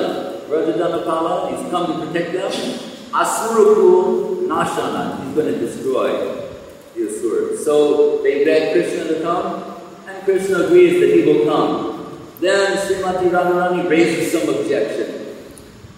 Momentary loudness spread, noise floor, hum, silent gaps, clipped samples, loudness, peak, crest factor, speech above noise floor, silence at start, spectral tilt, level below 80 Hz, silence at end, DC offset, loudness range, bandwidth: 14 LU; -39 dBFS; none; none; under 0.1%; -17 LUFS; 0 dBFS; 16 dB; 23 dB; 0 s; -5 dB/octave; -56 dBFS; 0.05 s; under 0.1%; 5 LU; 16 kHz